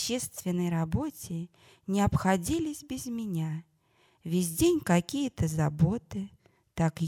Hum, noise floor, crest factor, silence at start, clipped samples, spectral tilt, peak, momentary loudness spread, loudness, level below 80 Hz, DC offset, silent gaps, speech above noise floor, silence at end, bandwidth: none; -67 dBFS; 20 dB; 0 s; under 0.1%; -6 dB/octave; -10 dBFS; 13 LU; -30 LUFS; -50 dBFS; under 0.1%; none; 38 dB; 0 s; 18.5 kHz